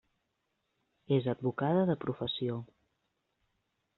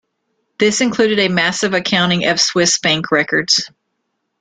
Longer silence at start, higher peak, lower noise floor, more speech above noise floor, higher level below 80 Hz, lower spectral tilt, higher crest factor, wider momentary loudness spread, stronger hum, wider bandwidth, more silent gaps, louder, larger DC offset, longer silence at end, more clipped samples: first, 1.1 s vs 0.6 s; second, -16 dBFS vs 0 dBFS; first, -81 dBFS vs -71 dBFS; second, 50 dB vs 56 dB; second, -70 dBFS vs -56 dBFS; first, -6 dB/octave vs -3 dB/octave; about the same, 20 dB vs 16 dB; first, 7 LU vs 3 LU; neither; second, 4.3 kHz vs 9.6 kHz; neither; second, -33 LUFS vs -14 LUFS; neither; first, 1.35 s vs 0.75 s; neither